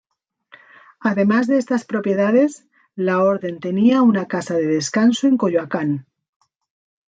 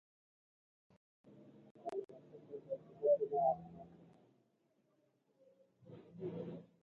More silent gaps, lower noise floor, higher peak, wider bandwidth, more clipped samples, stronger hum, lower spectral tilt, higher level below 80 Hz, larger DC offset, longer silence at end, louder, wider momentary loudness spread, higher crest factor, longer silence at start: second, none vs 1.71-1.75 s; second, -64 dBFS vs -78 dBFS; first, -4 dBFS vs -24 dBFS; first, 9.2 kHz vs 6.8 kHz; neither; neither; second, -6 dB/octave vs -8.5 dB/octave; first, -66 dBFS vs -82 dBFS; neither; first, 1.05 s vs 0.2 s; first, -18 LUFS vs -40 LUFS; second, 8 LU vs 25 LU; second, 14 dB vs 22 dB; second, 1 s vs 1.25 s